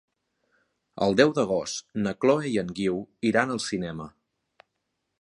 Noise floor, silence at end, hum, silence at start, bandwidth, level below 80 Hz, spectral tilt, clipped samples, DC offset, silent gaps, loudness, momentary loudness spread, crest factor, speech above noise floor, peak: -80 dBFS; 1.1 s; none; 0.95 s; 11 kHz; -60 dBFS; -5 dB/octave; under 0.1%; under 0.1%; none; -26 LUFS; 11 LU; 24 dB; 54 dB; -4 dBFS